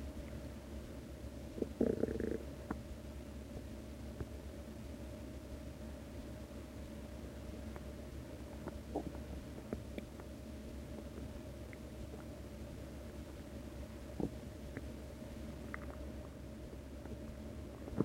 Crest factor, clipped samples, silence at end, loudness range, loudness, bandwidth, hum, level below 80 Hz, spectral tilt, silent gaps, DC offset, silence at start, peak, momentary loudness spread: 28 dB; under 0.1%; 0 s; 6 LU; -47 LUFS; 16 kHz; none; -52 dBFS; -7 dB/octave; none; under 0.1%; 0 s; -18 dBFS; 6 LU